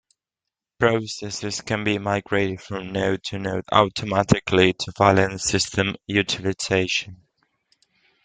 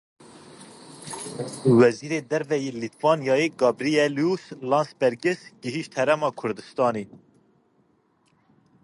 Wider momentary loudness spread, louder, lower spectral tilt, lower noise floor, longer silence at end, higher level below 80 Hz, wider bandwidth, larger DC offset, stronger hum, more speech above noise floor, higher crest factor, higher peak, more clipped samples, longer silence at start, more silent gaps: second, 10 LU vs 14 LU; about the same, -22 LUFS vs -24 LUFS; about the same, -4.5 dB/octave vs -5.5 dB/octave; first, -87 dBFS vs -65 dBFS; second, 1.1 s vs 1.8 s; first, -52 dBFS vs -70 dBFS; second, 9.6 kHz vs 11.5 kHz; neither; neither; first, 64 dB vs 42 dB; about the same, 22 dB vs 22 dB; about the same, -2 dBFS vs -4 dBFS; neither; first, 0.8 s vs 0.35 s; neither